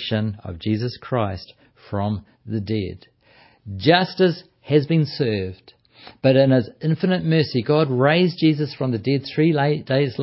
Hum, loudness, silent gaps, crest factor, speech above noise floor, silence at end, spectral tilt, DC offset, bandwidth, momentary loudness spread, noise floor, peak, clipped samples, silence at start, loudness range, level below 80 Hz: none; -21 LUFS; none; 18 dB; 34 dB; 0 s; -11 dB/octave; under 0.1%; 5.8 kHz; 12 LU; -54 dBFS; -2 dBFS; under 0.1%; 0 s; 8 LU; -50 dBFS